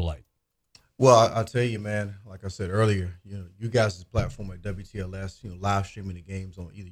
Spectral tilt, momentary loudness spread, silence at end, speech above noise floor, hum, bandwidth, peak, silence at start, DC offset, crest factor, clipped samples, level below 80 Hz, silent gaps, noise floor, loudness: -6 dB/octave; 20 LU; 0 s; 50 dB; none; 14 kHz; -4 dBFS; 0 s; under 0.1%; 24 dB; under 0.1%; -46 dBFS; none; -76 dBFS; -26 LUFS